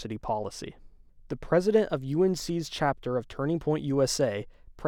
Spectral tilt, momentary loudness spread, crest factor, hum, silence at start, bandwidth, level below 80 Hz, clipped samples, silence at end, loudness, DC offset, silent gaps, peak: -5.5 dB/octave; 15 LU; 18 dB; none; 0 s; 18 kHz; -52 dBFS; under 0.1%; 0 s; -28 LUFS; under 0.1%; none; -10 dBFS